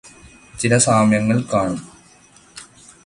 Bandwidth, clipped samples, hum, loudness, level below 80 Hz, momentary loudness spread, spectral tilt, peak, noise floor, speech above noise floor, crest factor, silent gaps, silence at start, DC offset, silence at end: 11.5 kHz; under 0.1%; none; -17 LUFS; -50 dBFS; 25 LU; -5 dB/octave; 0 dBFS; -49 dBFS; 33 dB; 20 dB; none; 0.05 s; under 0.1%; 0.4 s